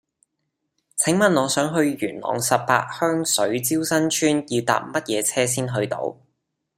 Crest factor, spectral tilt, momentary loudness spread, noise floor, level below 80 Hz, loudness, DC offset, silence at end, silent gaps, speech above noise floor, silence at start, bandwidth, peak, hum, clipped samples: 20 dB; -3.5 dB/octave; 7 LU; -77 dBFS; -64 dBFS; -21 LUFS; under 0.1%; 0.65 s; none; 56 dB; 0.95 s; 16 kHz; -2 dBFS; none; under 0.1%